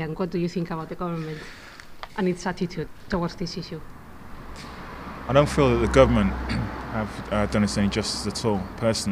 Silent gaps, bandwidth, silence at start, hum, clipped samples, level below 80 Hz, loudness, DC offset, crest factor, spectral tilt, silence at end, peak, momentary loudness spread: none; 15.5 kHz; 0 s; none; under 0.1%; -38 dBFS; -25 LUFS; under 0.1%; 24 dB; -5.5 dB/octave; 0 s; 0 dBFS; 21 LU